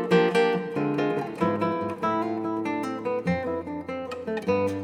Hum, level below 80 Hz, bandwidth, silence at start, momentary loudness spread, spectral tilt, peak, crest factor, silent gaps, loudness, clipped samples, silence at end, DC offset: none; -66 dBFS; 12.5 kHz; 0 s; 10 LU; -7 dB/octave; -10 dBFS; 16 dB; none; -27 LUFS; under 0.1%; 0 s; under 0.1%